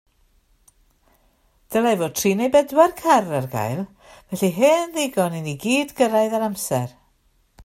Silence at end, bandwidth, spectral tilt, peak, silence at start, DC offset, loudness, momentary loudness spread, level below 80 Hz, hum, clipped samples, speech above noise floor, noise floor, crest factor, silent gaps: 0 s; 16 kHz; -5 dB/octave; -2 dBFS; 1.7 s; under 0.1%; -20 LUFS; 9 LU; -58 dBFS; none; under 0.1%; 42 dB; -62 dBFS; 20 dB; none